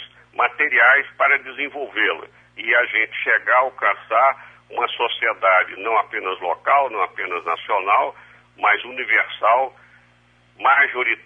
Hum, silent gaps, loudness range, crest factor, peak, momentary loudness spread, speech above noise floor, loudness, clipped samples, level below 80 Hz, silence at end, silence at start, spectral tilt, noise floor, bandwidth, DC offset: 60 Hz at -60 dBFS; none; 3 LU; 18 dB; -4 dBFS; 10 LU; 36 dB; -18 LUFS; under 0.1%; -68 dBFS; 0.1 s; 0 s; -4 dB/octave; -56 dBFS; 7.2 kHz; under 0.1%